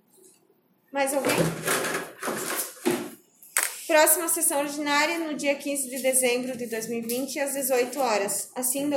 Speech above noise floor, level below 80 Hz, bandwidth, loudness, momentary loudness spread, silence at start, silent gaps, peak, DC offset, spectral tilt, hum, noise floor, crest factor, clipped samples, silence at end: 39 dB; -68 dBFS; 17 kHz; -25 LUFS; 10 LU; 0.95 s; none; -6 dBFS; under 0.1%; -2.5 dB/octave; none; -65 dBFS; 22 dB; under 0.1%; 0 s